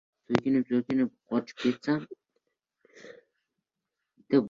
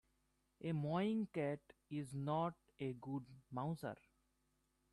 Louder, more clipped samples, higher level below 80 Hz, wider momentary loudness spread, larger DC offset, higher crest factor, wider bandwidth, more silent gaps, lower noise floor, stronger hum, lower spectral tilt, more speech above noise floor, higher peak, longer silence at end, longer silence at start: first, -29 LUFS vs -44 LUFS; neither; first, -68 dBFS vs -78 dBFS; first, 17 LU vs 11 LU; neither; first, 26 dB vs 16 dB; second, 7.4 kHz vs 12.5 kHz; neither; first, -86 dBFS vs -82 dBFS; neither; about the same, -7 dB/octave vs -8 dB/octave; first, 58 dB vs 39 dB; first, -6 dBFS vs -28 dBFS; second, 0 s vs 1 s; second, 0.3 s vs 0.6 s